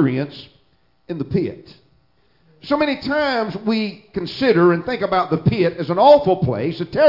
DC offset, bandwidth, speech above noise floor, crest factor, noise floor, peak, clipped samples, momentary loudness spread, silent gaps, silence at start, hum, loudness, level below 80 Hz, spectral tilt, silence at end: under 0.1%; 5.8 kHz; 44 dB; 18 dB; -61 dBFS; 0 dBFS; under 0.1%; 15 LU; none; 0 s; none; -18 LUFS; -50 dBFS; -8.5 dB/octave; 0 s